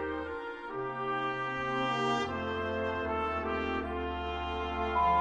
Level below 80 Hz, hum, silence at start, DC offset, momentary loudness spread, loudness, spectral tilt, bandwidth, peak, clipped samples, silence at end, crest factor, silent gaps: -48 dBFS; none; 0 s; under 0.1%; 7 LU; -33 LUFS; -6 dB/octave; 10 kHz; -16 dBFS; under 0.1%; 0 s; 16 dB; none